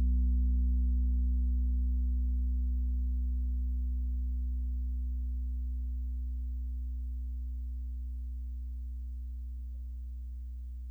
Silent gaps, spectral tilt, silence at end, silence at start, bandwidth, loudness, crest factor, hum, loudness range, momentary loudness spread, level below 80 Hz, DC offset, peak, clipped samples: none; -11 dB/octave; 0 s; 0 s; 0.5 kHz; -36 LUFS; 10 dB; none; 9 LU; 12 LU; -32 dBFS; under 0.1%; -22 dBFS; under 0.1%